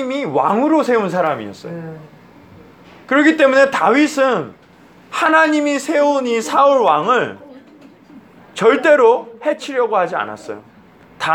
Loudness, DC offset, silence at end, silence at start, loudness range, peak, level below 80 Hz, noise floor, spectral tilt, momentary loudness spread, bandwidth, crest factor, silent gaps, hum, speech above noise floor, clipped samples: -15 LUFS; under 0.1%; 0 s; 0 s; 2 LU; 0 dBFS; -64 dBFS; -45 dBFS; -4.5 dB/octave; 18 LU; 14.5 kHz; 16 dB; none; none; 30 dB; under 0.1%